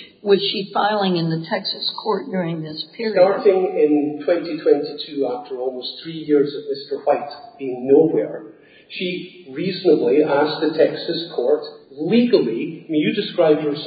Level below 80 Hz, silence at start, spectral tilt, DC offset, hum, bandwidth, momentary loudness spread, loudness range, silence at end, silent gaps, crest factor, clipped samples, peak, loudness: -72 dBFS; 0 s; -11 dB/octave; under 0.1%; none; 5 kHz; 13 LU; 3 LU; 0 s; none; 18 dB; under 0.1%; -2 dBFS; -20 LUFS